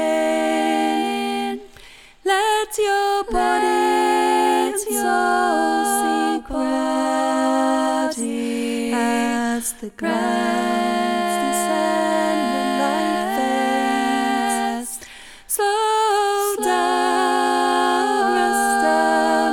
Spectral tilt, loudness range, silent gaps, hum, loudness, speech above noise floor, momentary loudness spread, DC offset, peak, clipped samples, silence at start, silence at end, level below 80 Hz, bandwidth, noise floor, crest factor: -2.5 dB/octave; 3 LU; none; none; -19 LUFS; 23 dB; 6 LU; under 0.1%; -6 dBFS; under 0.1%; 0 s; 0 s; -48 dBFS; 19 kHz; -44 dBFS; 14 dB